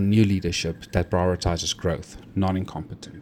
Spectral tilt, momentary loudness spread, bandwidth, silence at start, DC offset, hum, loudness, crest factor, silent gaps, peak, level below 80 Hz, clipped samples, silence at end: -5.5 dB/octave; 12 LU; 15.5 kHz; 0 s; under 0.1%; none; -25 LUFS; 18 dB; none; -6 dBFS; -42 dBFS; under 0.1%; 0 s